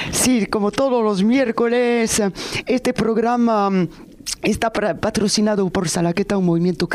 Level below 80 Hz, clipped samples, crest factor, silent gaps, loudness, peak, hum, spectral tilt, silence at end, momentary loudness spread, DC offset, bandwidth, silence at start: -44 dBFS; under 0.1%; 14 dB; none; -19 LUFS; -4 dBFS; none; -4.5 dB/octave; 0 s; 5 LU; under 0.1%; 15.5 kHz; 0 s